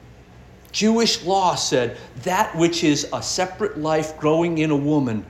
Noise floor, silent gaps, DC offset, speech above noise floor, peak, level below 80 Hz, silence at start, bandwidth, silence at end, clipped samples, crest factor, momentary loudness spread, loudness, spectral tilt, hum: -45 dBFS; none; under 0.1%; 25 dB; -4 dBFS; -50 dBFS; 0.05 s; 15.5 kHz; 0 s; under 0.1%; 16 dB; 6 LU; -21 LUFS; -4 dB/octave; none